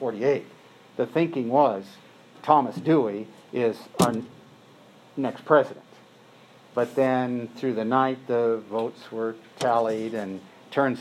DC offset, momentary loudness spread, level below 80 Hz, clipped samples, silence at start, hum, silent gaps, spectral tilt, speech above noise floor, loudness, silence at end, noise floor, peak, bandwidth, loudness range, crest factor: under 0.1%; 13 LU; -72 dBFS; under 0.1%; 0 s; none; none; -6 dB/octave; 28 dB; -25 LUFS; 0 s; -52 dBFS; -4 dBFS; 15.5 kHz; 3 LU; 22 dB